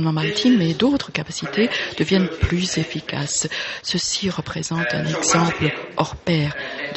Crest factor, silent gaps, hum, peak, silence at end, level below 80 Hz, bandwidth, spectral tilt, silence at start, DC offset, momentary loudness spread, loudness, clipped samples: 20 dB; none; none; -2 dBFS; 0 s; -42 dBFS; 8.4 kHz; -4 dB/octave; 0 s; under 0.1%; 8 LU; -21 LUFS; under 0.1%